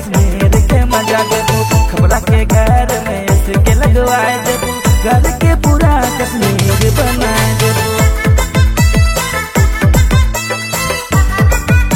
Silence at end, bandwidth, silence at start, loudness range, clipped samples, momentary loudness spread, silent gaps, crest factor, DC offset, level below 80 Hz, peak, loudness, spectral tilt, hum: 0 s; 16.5 kHz; 0 s; 1 LU; under 0.1%; 4 LU; none; 10 dB; under 0.1%; -14 dBFS; 0 dBFS; -12 LUFS; -5 dB/octave; none